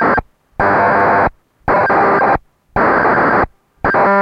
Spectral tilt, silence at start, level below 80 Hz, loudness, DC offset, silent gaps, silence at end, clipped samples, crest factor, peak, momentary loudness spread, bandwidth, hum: -8 dB/octave; 0 s; -36 dBFS; -13 LUFS; under 0.1%; none; 0 s; under 0.1%; 10 dB; -4 dBFS; 9 LU; 8.4 kHz; none